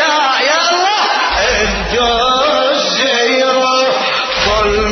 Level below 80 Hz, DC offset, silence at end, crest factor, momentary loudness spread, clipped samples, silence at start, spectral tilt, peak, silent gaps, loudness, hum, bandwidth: -30 dBFS; under 0.1%; 0 s; 12 dB; 2 LU; under 0.1%; 0 s; -2 dB/octave; 0 dBFS; none; -12 LUFS; none; 6.6 kHz